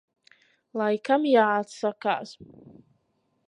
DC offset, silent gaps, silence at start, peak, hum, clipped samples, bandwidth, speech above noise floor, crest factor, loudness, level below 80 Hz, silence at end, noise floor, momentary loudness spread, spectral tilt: under 0.1%; none; 0.75 s; -8 dBFS; none; under 0.1%; 10.5 kHz; 47 dB; 20 dB; -25 LUFS; -76 dBFS; 1.05 s; -72 dBFS; 12 LU; -5 dB/octave